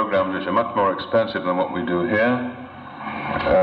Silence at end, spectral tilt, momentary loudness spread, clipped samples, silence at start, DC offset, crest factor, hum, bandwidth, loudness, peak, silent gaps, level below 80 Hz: 0 s; -8.5 dB/octave; 12 LU; under 0.1%; 0 s; under 0.1%; 14 dB; none; 5.2 kHz; -22 LUFS; -8 dBFS; none; -48 dBFS